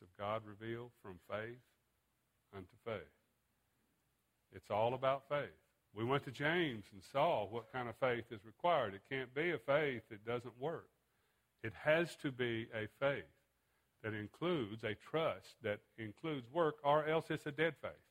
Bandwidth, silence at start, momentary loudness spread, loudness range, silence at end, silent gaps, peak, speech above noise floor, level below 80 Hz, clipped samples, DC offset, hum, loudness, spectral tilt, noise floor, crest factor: 16 kHz; 0 s; 15 LU; 10 LU; 0.15 s; none; -18 dBFS; 42 dB; -76 dBFS; under 0.1%; under 0.1%; none; -40 LUFS; -6.5 dB/octave; -82 dBFS; 22 dB